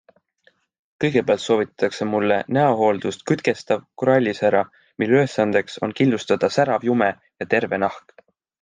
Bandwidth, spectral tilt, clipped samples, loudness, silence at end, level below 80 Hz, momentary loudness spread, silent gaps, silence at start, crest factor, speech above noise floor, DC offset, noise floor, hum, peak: 9.6 kHz; -6 dB/octave; under 0.1%; -20 LUFS; 0.6 s; -64 dBFS; 7 LU; none; 1 s; 18 dB; 42 dB; under 0.1%; -62 dBFS; none; -2 dBFS